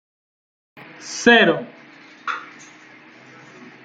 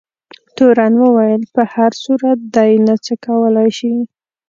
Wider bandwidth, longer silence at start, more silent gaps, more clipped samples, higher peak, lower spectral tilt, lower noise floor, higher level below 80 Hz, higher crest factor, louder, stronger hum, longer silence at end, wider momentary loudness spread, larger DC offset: first, 9.2 kHz vs 7.4 kHz; first, 1 s vs 0.55 s; neither; neither; about the same, -2 dBFS vs 0 dBFS; second, -3.5 dB/octave vs -6.5 dB/octave; about the same, -46 dBFS vs -44 dBFS; about the same, -66 dBFS vs -62 dBFS; first, 22 dB vs 12 dB; second, -17 LUFS vs -13 LUFS; neither; first, 1.4 s vs 0.45 s; first, 25 LU vs 8 LU; neither